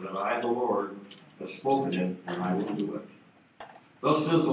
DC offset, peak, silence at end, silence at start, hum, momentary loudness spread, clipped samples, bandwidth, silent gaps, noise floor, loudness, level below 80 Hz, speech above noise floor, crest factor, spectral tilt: under 0.1%; -10 dBFS; 0 s; 0 s; none; 22 LU; under 0.1%; 4 kHz; none; -51 dBFS; -29 LUFS; -76 dBFS; 23 dB; 20 dB; -5.5 dB/octave